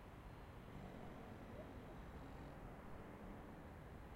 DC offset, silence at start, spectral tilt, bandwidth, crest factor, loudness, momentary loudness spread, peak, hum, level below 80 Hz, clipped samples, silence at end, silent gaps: under 0.1%; 0 s; -7 dB/octave; 16 kHz; 14 dB; -56 LUFS; 2 LU; -42 dBFS; none; -62 dBFS; under 0.1%; 0 s; none